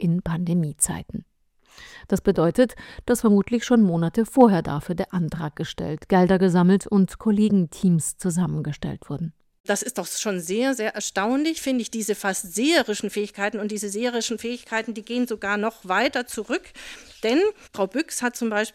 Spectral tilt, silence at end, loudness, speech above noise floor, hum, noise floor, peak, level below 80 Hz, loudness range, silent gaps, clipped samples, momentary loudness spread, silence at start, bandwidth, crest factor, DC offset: -5 dB/octave; 0.05 s; -23 LUFS; 37 dB; none; -60 dBFS; -4 dBFS; -50 dBFS; 5 LU; 9.60-9.64 s; under 0.1%; 11 LU; 0 s; 16.5 kHz; 20 dB; under 0.1%